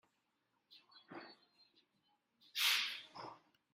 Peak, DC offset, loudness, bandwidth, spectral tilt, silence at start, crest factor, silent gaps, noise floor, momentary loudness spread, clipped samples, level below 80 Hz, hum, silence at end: -22 dBFS; under 0.1%; -37 LUFS; 16 kHz; 1 dB/octave; 0.7 s; 24 dB; none; -84 dBFS; 22 LU; under 0.1%; under -90 dBFS; none; 0.35 s